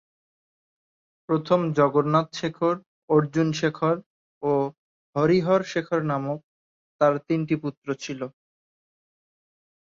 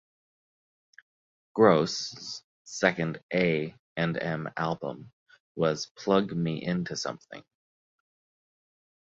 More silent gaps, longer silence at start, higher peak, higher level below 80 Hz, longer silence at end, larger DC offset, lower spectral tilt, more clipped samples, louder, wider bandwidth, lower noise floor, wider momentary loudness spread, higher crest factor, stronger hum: first, 2.86-3.08 s, 4.06-4.41 s, 4.78-5.13 s, 6.44-6.99 s, 7.77-7.82 s vs 2.44-2.65 s, 3.23-3.29 s, 3.79-3.96 s, 5.13-5.26 s, 5.40-5.55 s, 5.91-5.95 s; second, 1.3 s vs 1.55 s; about the same, -6 dBFS vs -6 dBFS; about the same, -66 dBFS vs -66 dBFS; second, 1.5 s vs 1.7 s; neither; first, -7 dB/octave vs -5.5 dB/octave; neither; first, -24 LUFS vs -28 LUFS; about the same, 7.6 kHz vs 7.8 kHz; about the same, under -90 dBFS vs under -90 dBFS; second, 11 LU vs 18 LU; second, 18 dB vs 24 dB; neither